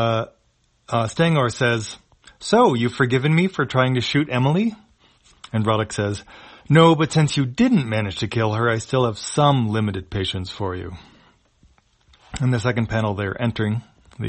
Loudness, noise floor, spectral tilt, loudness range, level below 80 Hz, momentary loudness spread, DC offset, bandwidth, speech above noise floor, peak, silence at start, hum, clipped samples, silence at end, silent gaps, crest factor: -20 LUFS; -63 dBFS; -6 dB/octave; 6 LU; -50 dBFS; 11 LU; under 0.1%; 8.8 kHz; 44 dB; 0 dBFS; 0 s; none; under 0.1%; 0 s; none; 20 dB